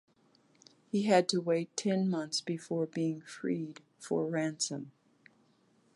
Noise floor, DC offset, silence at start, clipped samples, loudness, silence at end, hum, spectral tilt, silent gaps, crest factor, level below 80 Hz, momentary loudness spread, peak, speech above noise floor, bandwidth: -69 dBFS; under 0.1%; 0.95 s; under 0.1%; -33 LUFS; 1.05 s; none; -5 dB/octave; none; 20 dB; -84 dBFS; 11 LU; -14 dBFS; 37 dB; 11.5 kHz